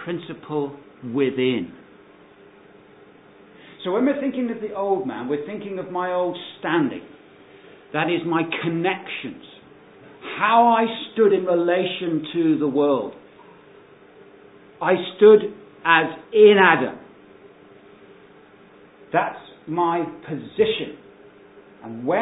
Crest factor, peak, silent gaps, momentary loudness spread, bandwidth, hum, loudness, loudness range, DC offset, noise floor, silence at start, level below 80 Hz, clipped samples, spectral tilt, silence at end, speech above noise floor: 22 dB; 0 dBFS; none; 18 LU; 4 kHz; none; -21 LUFS; 11 LU; under 0.1%; -49 dBFS; 0 s; -68 dBFS; under 0.1%; -10 dB/octave; 0 s; 29 dB